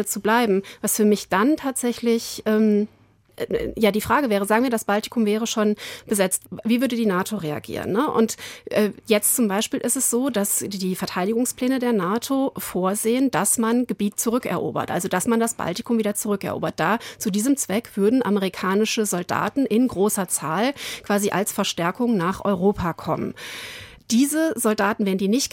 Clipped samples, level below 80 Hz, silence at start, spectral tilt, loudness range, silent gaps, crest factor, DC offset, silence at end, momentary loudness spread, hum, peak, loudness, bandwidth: under 0.1%; -54 dBFS; 0 s; -4 dB/octave; 2 LU; none; 16 dB; under 0.1%; 0.05 s; 7 LU; none; -6 dBFS; -22 LUFS; 17 kHz